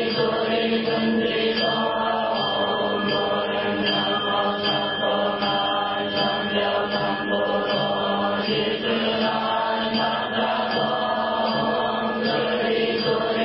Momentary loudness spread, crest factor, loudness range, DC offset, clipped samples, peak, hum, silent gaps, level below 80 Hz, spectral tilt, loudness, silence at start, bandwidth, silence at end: 2 LU; 14 dB; 1 LU; under 0.1%; under 0.1%; -10 dBFS; none; none; -56 dBFS; -9 dB/octave; -22 LUFS; 0 s; 5.8 kHz; 0 s